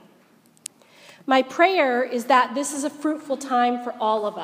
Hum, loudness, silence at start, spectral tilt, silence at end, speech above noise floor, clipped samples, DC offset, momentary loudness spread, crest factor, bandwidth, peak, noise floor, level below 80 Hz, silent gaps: none; -22 LUFS; 1.25 s; -2.5 dB/octave; 0 s; 35 dB; under 0.1%; under 0.1%; 20 LU; 20 dB; 15.5 kHz; -4 dBFS; -57 dBFS; -86 dBFS; none